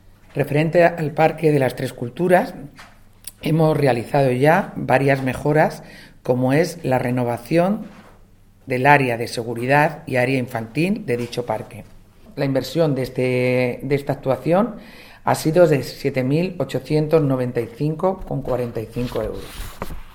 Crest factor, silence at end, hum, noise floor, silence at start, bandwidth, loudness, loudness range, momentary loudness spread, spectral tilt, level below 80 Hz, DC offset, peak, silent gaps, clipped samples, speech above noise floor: 20 dB; 0.05 s; none; -49 dBFS; 0.35 s; 19 kHz; -20 LUFS; 4 LU; 12 LU; -7 dB/octave; -44 dBFS; under 0.1%; 0 dBFS; none; under 0.1%; 30 dB